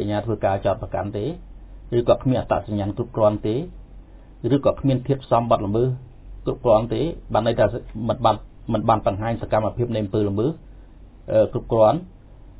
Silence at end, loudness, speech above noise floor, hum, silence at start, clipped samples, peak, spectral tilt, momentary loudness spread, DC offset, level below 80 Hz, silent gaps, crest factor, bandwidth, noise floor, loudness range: 0.05 s; -22 LUFS; 23 dB; none; 0 s; under 0.1%; -4 dBFS; -11.5 dB/octave; 9 LU; under 0.1%; -40 dBFS; none; 18 dB; 4 kHz; -44 dBFS; 2 LU